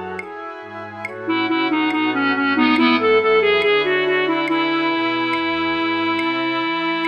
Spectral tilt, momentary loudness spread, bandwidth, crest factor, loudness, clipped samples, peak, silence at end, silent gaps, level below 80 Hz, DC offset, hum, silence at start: -5.5 dB/octave; 14 LU; 8.8 kHz; 14 dB; -18 LUFS; under 0.1%; -4 dBFS; 0 s; none; -62 dBFS; under 0.1%; none; 0 s